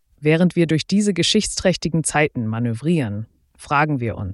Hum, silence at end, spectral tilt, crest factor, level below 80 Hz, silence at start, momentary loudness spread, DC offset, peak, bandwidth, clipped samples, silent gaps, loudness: none; 0 s; -5 dB/octave; 16 dB; -46 dBFS; 0.2 s; 7 LU; under 0.1%; -4 dBFS; 12 kHz; under 0.1%; none; -19 LUFS